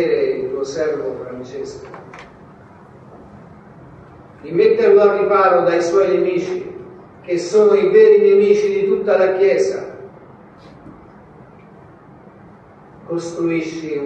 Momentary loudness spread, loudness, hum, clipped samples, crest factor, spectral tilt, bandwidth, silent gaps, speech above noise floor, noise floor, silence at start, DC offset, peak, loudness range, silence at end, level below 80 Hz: 20 LU; -15 LUFS; none; under 0.1%; 16 dB; -6 dB/octave; 8.4 kHz; none; 28 dB; -43 dBFS; 0 s; under 0.1%; 0 dBFS; 17 LU; 0 s; -58 dBFS